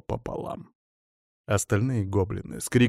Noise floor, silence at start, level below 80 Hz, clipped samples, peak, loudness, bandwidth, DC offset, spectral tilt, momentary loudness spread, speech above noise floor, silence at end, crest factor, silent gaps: under -90 dBFS; 0.1 s; -50 dBFS; under 0.1%; -10 dBFS; -28 LUFS; 15.5 kHz; under 0.1%; -6 dB/octave; 13 LU; over 64 dB; 0 s; 18 dB; 0.75-1.44 s